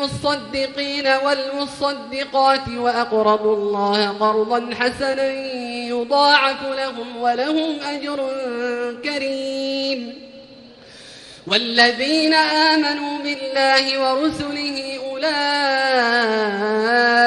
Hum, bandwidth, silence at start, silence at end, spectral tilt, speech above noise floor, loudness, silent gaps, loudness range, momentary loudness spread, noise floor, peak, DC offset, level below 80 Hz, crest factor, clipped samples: none; 11.5 kHz; 0 s; 0 s; -3.5 dB/octave; 24 dB; -19 LUFS; none; 6 LU; 10 LU; -43 dBFS; 0 dBFS; under 0.1%; -56 dBFS; 18 dB; under 0.1%